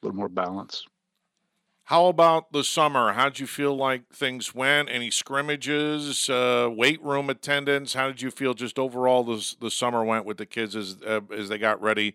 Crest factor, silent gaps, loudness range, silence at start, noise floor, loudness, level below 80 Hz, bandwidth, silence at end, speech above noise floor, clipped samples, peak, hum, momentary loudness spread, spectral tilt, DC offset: 20 dB; none; 3 LU; 0.05 s; -78 dBFS; -24 LUFS; -78 dBFS; 16 kHz; 0.05 s; 53 dB; under 0.1%; -4 dBFS; none; 9 LU; -3 dB/octave; under 0.1%